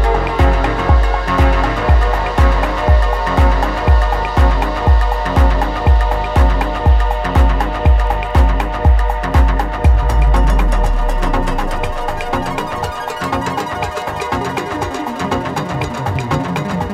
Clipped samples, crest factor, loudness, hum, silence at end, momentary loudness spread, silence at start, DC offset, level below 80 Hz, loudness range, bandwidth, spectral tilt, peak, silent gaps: under 0.1%; 12 dB; -16 LUFS; none; 0 s; 7 LU; 0 s; under 0.1%; -14 dBFS; 6 LU; 13 kHz; -6.5 dB/octave; 0 dBFS; none